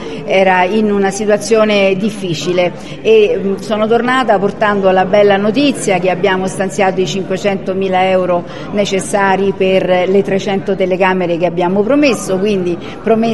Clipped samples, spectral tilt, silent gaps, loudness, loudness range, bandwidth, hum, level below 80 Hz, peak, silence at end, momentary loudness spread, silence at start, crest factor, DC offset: under 0.1%; -5 dB/octave; none; -13 LUFS; 2 LU; 12.5 kHz; none; -44 dBFS; 0 dBFS; 0 s; 7 LU; 0 s; 12 dB; 2%